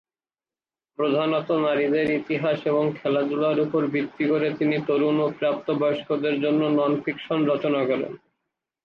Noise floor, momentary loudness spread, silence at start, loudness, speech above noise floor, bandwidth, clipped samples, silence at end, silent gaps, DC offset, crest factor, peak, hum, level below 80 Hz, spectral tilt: under -90 dBFS; 4 LU; 1 s; -23 LUFS; over 67 dB; 5.6 kHz; under 0.1%; 0.65 s; none; under 0.1%; 12 dB; -12 dBFS; none; -68 dBFS; -8.5 dB/octave